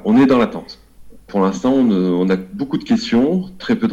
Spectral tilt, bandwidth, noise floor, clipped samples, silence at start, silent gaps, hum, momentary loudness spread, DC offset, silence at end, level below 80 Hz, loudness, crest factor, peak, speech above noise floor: -7 dB/octave; 8 kHz; -39 dBFS; under 0.1%; 0.05 s; none; none; 10 LU; under 0.1%; 0 s; -48 dBFS; -17 LUFS; 10 dB; -6 dBFS; 24 dB